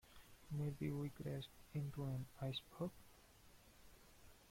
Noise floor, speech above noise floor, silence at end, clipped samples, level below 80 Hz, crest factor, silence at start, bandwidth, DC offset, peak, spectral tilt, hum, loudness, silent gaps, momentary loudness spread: -67 dBFS; 20 dB; 0 s; under 0.1%; -68 dBFS; 16 dB; 0.05 s; 16.5 kHz; under 0.1%; -32 dBFS; -7 dB/octave; none; -48 LUFS; none; 21 LU